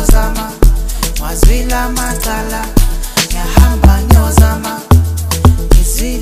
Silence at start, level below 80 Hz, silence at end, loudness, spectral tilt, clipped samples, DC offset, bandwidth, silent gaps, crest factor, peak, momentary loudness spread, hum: 0 s; -12 dBFS; 0 s; -12 LUFS; -5 dB/octave; 0.5%; under 0.1%; 16 kHz; none; 10 dB; 0 dBFS; 8 LU; none